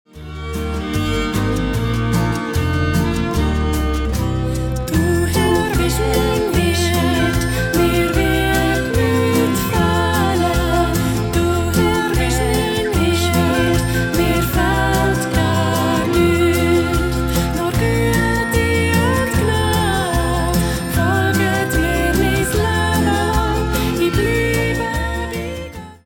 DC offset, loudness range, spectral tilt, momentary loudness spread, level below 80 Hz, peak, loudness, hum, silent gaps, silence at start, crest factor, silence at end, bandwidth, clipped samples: under 0.1%; 3 LU; -5.5 dB/octave; 4 LU; -26 dBFS; -4 dBFS; -17 LUFS; none; none; 0.15 s; 12 dB; 0.1 s; over 20 kHz; under 0.1%